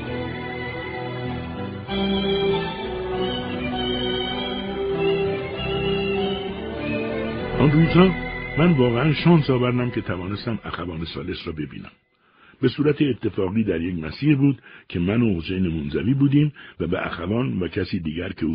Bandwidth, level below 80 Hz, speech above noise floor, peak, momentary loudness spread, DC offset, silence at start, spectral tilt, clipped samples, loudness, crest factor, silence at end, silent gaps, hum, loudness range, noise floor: 5.2 kHz; -42 dBFS; 34 dB; -2 dBFS; 12 LU; under 0.1%; 0 s; -5.5 dB/octave; under 0.1%; -23 LUFS; 20 dB; 0 s; none; none; 6 LU; -55 dBFS